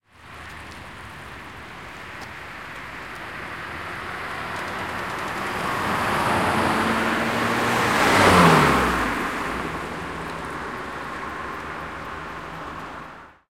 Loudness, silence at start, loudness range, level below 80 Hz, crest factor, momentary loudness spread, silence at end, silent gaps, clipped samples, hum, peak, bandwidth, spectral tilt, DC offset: -23 LUFS; 0.2 s; 16 LU; -46 dBFS; 22 dB; 20 LU; 0.2 s; none; under 0.1%; none; -2 dBFS; 16.5 kHz; -4.5 dB/octave; 0.2%